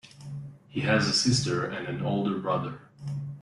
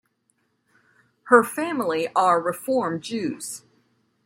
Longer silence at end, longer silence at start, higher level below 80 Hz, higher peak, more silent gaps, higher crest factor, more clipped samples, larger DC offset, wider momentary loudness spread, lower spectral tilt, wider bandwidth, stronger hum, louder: second, 0 s vs 0.65 s; second, 0.05 s vs 1.25 s; first, -60 dBFS vs -72 dBFS; second, -12 dBFS vs -2 dBFS; neither; about the same, 18 dB vs 22 dB; neither; neither; first, 18 LU vs 13 LU; about the same, -4.5 dB/octave vs -4.5 dB/octave; second, 11.5 kHz vs 16 kHz; neither; second, -27 LUFS vs -22 LUFS